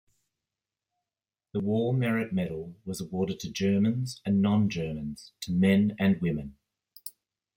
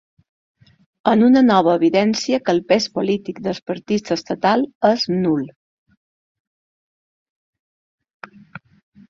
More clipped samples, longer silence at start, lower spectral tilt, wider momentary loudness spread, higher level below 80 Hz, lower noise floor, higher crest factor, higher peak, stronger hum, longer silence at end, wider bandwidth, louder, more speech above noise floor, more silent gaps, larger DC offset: neither; first, 1.55 s vs 1.05 s; first, -7 dB/octave vs -5.5 dB/octave; first, 16 LU vs 12 LU; about the same, -60 dBFS vs -62 dBFS; first, under -90 dBFS vs -42 dBFS; about the same, 18 dB vs 18 dB; second, -12 dBFS vs -2 dBFS; neither; second, 0.45 s vs 3.6 s; first, 16.5 kHz vs 7.6 kHz; second, -28 LUFS vs -18 LUFS; first, over 63 dB vs 25 dB; second, none vs 3.62-3.66 s, 4.75-4.81 s; neither